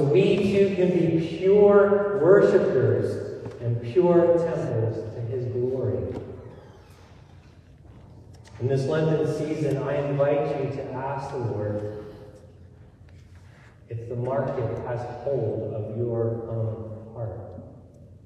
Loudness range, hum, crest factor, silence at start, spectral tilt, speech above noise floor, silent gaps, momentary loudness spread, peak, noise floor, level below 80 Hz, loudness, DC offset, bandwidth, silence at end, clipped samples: 13 LU; none; 20 dB; 0 s; -8.5 dB/octave; 27 dB; none; 17 LU; -6 dBFS; -50 dBFS; -52 dBFS; -24 LUFS; under 0.1%; 9.6 kHz; 0.1 s; under 0.1%